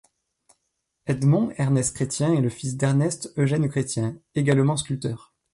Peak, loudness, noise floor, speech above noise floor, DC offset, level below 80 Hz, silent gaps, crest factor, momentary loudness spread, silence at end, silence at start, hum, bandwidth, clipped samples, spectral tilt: -8 dBFS; -24 LUFS; -77 dBFS; 54 dB; under 0.1%; -56 dBFS; none; 16 dB; 8 LU; 0.35 s; 1.05 s; none; 11.5 kHz; under 0.1%; -6 dB/octave